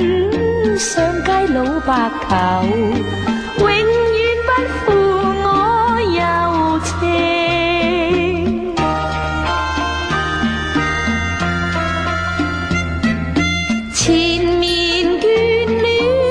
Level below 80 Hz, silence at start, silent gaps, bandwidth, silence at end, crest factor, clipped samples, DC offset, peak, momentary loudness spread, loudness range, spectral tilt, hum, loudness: -32 dBFS; 0 s; none; 10.5 kHz; 0 s; 14 dB; under 0.1%; under 0.1%; -2 dBFS; 5 LU; 3 LU; -4.5 dB/octave; none; -16 LUFS